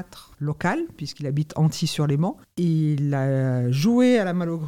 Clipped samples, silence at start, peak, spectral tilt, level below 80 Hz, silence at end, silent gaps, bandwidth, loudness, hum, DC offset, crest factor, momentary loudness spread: under 0.1%; 0 s; -8 dBFS; -7 dB/octave; -58 dBFS; 0 s; none; 15.5 kHz; -23 LUFS; none; 0.2%; 14 dB; 11 LU